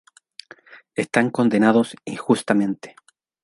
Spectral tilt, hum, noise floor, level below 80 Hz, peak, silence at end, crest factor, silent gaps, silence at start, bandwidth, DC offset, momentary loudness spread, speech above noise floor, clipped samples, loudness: -6 dB/octave; none; -47 dBFS; -66 dBFS; -2 dBFS; 0.55 s; 20 dB; none; 0.95 s; 11.5 kHz; under 0.1%; 16 LU; 27 dB; under 0.1%; -20 LUFS